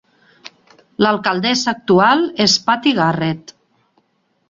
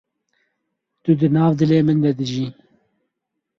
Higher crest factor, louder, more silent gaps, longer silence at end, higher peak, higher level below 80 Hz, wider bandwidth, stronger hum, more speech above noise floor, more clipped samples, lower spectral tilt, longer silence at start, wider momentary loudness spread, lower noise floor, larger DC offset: about the same, 16 dB vs 16 dB; first, -15 LUFS vs -18 LUFS; neither; about the same, 1.1 s vs 1.1 s; first, 0 dBFS vs -4 dBFS; about the same, -56 dBFS vs -58 dBFS; first, 7.8 kHz vs 7 kHz; neither; second, 49 dB vs 62 dB; neither; second, -4 dB/octave vs -8.5 dB/octave; about the same, 1 s vs 1.05 s; about the same, 9 LU vs 11 LU; second, -64 dBFS vs -79 dBFS; neither